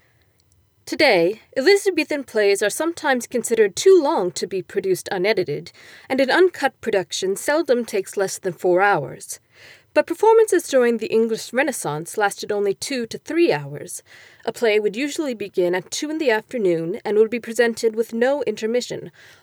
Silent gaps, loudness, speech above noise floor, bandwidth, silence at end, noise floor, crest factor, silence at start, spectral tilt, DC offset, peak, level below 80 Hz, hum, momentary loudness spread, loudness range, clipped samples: none; -20 LUFS; 40 dB; 19.5 kHz; 0.35 s; -60 dBFS; 16 dB; 0.85 s; -3.5 dB/octave; under 0.1%; -4 dBFS; -70 dBFS; none; 10 LU; 4 LU; under 0.1%